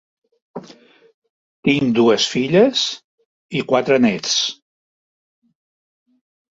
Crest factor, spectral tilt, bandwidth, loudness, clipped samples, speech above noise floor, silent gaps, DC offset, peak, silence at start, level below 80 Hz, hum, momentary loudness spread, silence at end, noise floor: 18 dB; -4 dB/octave; 8 kHz; -17 LUFS; under 0.1%; 30 dB; 1.14-1.22 s, 1.30-1.63 s, 3.04-3.18 s, 3.26-3.49 s; under 0.1%; -2 dBFS; 0.55 s; -60 dBFS; none; 22 LU; 2.05 s; -46 dBFS